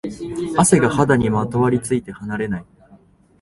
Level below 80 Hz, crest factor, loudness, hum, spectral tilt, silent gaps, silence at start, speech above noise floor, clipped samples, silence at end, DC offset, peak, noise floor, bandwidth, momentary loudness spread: -46 dBFS; 18 dB; -18 LUFS; none; -5.5 dB/octave; none; 0.05 s; 32 dB; under 0.1%; 0.8 s; under 0.1%; 0 dBFS; -50 dBFS; 12 kHz; 13 LU